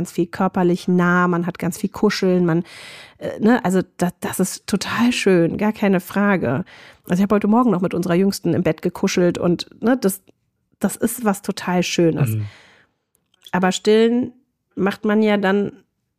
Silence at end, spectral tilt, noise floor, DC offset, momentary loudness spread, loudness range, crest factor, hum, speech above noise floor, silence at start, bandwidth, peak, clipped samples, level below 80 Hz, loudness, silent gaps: 0.45 s; -6 dB/octave; -67 dBFS; under 0.1%; 9 LU; 3 LU; 14 dB; none; 48 dB; 0 s; 15.5 kHz; -4 dBFS; under 0.1%; -56 dBFS; -19 LUFS; none